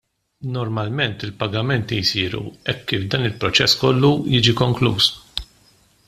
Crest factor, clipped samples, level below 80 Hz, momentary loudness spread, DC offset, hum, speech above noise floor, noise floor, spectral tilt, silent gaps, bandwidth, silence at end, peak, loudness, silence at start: 20 dB; under 0.1%; -48 dBFS; 11 LU; under 0.1%; none; 36 dB; -56 dBFS; -5 dB/octave; none; 14.5 kHz; 0.65 s; -2 dBFS; -19 LUFS; 0.4 s